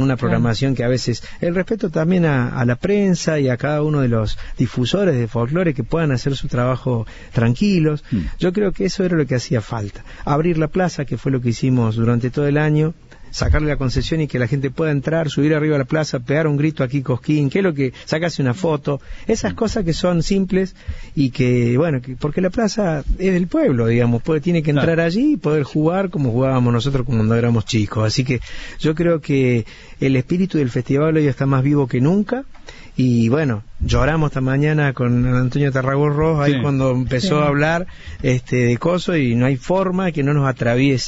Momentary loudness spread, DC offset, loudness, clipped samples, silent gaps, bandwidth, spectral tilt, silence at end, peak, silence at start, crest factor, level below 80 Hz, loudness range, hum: 6 LU; under 0.1%; -18 LUFS; under 0.1%; none; 8 kHz; -7 dB/octave; 0 s; -4 dBFS; 0 s; 14 dB; -34 dBFS; 2 LU; none